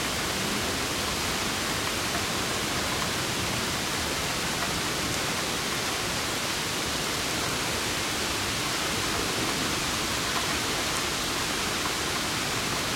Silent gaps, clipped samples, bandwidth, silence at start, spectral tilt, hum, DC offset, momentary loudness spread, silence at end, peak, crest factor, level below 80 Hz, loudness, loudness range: none; under 0.1%; 16.5 kHz; 0 s; -2 dB/octave; none; under 0.1%; 1 LU; 0 s; -10 dBFS; 20 dB; -46 dBFS; -27 LUFS; 1 LU